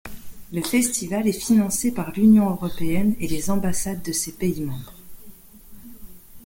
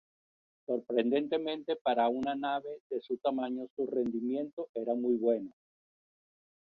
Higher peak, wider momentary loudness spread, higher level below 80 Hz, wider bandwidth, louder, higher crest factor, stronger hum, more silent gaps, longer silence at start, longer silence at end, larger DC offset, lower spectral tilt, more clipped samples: first, -6 dBFS vs -16 dBFS; first, 14 LU vs 8 LU; first, -44 dBFS vs -76 dBFS; first, 17 kHz vs 5.4 kHz; first, -22 LUFS vs -33 LUFS; about the same, 16 dB vs 18 dB; neither; second, none vs 1.81-1.85 s, 2.80-2.90 s, 3.70-3.77 s, 4.53-4.57 s, 4.69-4.74 s; second, 0.05 s vs 0.7 s; second, 0.05 s vs 1.2 s; neither; second, -5 dB/octave vs -7.5 dB/octave; neither